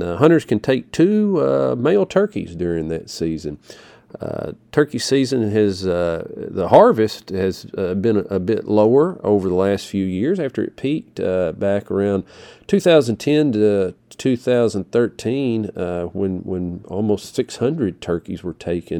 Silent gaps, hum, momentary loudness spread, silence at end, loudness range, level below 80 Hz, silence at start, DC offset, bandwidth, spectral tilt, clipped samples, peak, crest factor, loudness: none; none; 11 LU; 0 s; 5 LU; -50 dBFS; 0 s; under 0.1%; 18.5 kHz; -6.5 dB/octave; under 0.1%; 0 dBFS; 18 dB; -19 LUFS